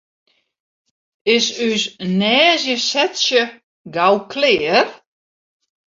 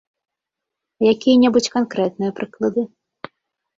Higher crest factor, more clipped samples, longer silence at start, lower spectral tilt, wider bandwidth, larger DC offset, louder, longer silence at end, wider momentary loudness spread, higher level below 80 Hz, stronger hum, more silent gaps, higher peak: about the same, 18 dB vs 16 dB; neither; first, 1.25 s vs 1 s; second, -3 dB/octave vs -5 dB/octave; about the same, 7.8 kHz vs 7.8 kHz; neither; about the same, -16 LUFS vs -18 LUFS; about the same, 1 s vs 0.9 s; second, 8 LU vs 25 LU; about the same, -62 dBFS vs -60 dBFS; neither; first, 3.63-3.85 s vs none; about the same, -2 dBFS vs -4 dBFS